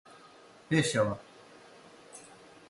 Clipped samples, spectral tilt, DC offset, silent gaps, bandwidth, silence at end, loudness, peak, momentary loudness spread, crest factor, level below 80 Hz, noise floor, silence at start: under 0.1%; -5 dB/octave; under 0.1%; none; 11.5 kHz; 0.5 s; -30 LUFS; -14 dBFS; 26 LU; 22 dB; -66 dBFS; -56 dBFS; 0.7 s